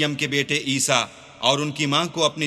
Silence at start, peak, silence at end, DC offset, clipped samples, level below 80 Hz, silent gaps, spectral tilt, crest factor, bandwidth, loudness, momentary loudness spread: 0 s; -2 dBFS; 0 s; under 0.1%; under 0.1%; -64 dBFS; none; -3 dB/octave; 22 dB; 14.5 kHz; -21 LUFS; 3 LU